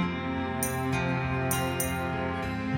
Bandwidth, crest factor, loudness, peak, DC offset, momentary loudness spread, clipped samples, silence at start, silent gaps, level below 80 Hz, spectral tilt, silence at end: over 20 kHz; 14 dB; -29 LUFS; -14 dBFS; under 0.1%; 3 LU; under 0.1%; 0 s; none; -46 dBFS; -5 dB/octave; 0 s